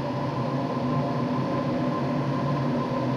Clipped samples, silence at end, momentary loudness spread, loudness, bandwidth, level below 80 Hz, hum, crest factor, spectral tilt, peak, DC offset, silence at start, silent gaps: under 0.1%; 0 s; 2 LU; -27 LUFS; 7.4 kHz; -56 dBFS; none; 10 dB; -8 dB/octave; -16 dBFS; under 0.1%; 0 s; none